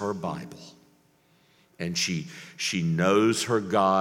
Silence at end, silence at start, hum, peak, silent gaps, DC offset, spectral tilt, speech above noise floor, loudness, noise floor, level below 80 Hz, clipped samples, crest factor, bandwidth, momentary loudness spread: 0 s; 0 s; none; -6 dBFS; none; under 0.1%; -4.5 dB/octave; 37 dB; -26 LUFS; -63 dBFS; -64 dBFS; under 0.1%; 20 dB; 16.5 kHz; 17 LU